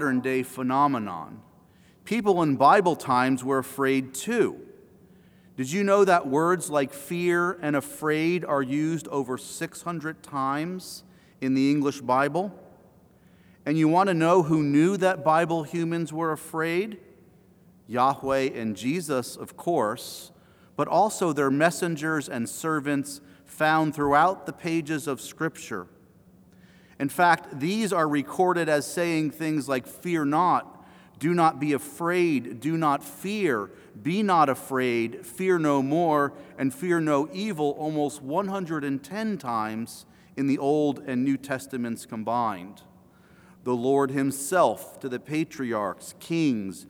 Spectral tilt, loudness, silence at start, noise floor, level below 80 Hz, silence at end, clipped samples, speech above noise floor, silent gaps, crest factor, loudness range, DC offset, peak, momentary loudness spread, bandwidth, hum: -5.5 dB/octave; -25 LUFS; 0 s; -56 dBFS; -66 dBFS; 0.05 s; under 0.1%; 31 dB; none; 22 dB; 5 LU; under 0.1%; -4 dBFS; 12 LU; over 20 kHz; none